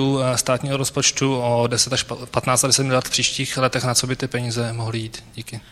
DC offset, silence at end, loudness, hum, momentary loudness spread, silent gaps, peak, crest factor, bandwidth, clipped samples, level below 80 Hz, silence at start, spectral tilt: under 0.1%; 0.1 s; -20 LUFS; none; 10 LU; none; 0 dBFS; 20 dB; 15 kHz; under 0.1%; -50 dBFS; 0 s; -3.5 dB/octave